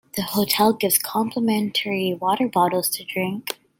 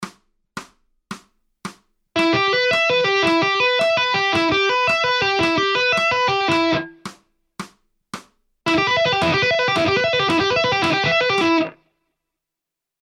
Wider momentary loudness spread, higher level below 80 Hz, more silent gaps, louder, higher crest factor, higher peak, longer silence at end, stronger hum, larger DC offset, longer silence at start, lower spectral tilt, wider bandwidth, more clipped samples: second, 7 LU vs 20 LU; second, -64 dBFS vs -54 dBFS; neither; second, -21 LUFS vs -17 LUFS; about the same, 18 dB vs 14 dB; about the same, -4 dBFS vs -6 dBFS; second, 0.25 s vs 1.3 s; neither; neither; first, 0.15 s vs 0 s; about the same, -3.5 dB/octave vs -4 dB/octave; first, 17 kHz vs 13 kHz; neither